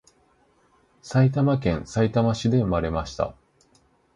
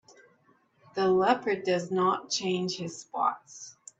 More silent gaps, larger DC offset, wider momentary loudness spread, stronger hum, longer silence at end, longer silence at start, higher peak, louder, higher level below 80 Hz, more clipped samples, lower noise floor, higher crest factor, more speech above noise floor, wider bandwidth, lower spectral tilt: neither; neither; second, 9 LU vs 15 LU; neither; first, 0.85 s vs 0.3 s; about the same, 1.05 s vs 0.95 s; about the same, -8 dBFS vs -10 dBFS; first, -23 LUFS vs -28 LUFS; first, -42 dBFS vs -74 dBFS; neither; second, -62 dBFS vs -66 dBFS; about the same, 16 dB vs 20 dB; about the same, 40 dB vs 38 dB; first, 10 kHz vs 8.2 kHz; first, -7.5 dB/octave vs -4.5 dB/octave